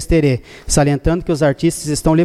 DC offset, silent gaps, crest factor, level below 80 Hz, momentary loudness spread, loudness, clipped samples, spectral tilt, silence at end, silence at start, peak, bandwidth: under 0.1%; none; 12 dB; -28 dBFS; 3 LU; -16 LUFS; under 0.1%; -5.5 dB/octave; 0 s; 0 s; -2 dBFS; 14.5 kHz